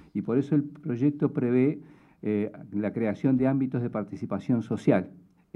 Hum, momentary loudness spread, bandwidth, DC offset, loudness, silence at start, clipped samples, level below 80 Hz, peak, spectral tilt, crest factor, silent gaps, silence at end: none; 9 LU; 8 kHz; under 0.1%; -27 LUFS; 0.15 s; under 0.1%; -68 dBFS; -8 dBFS; -9.5 dB/octave; 18 dB; none; 0.35 s